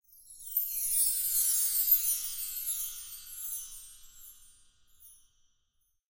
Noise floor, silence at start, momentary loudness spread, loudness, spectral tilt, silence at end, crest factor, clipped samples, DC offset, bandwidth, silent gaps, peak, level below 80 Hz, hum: -76 dBFS; 0.15 s; 19 LU; -28 LUFS; 4 dB/octave; 0.95 s; 22 dB; under 0.1%; under 0.1%; 16.5 kHz; none; -12 dBFS; -64 dBFS; none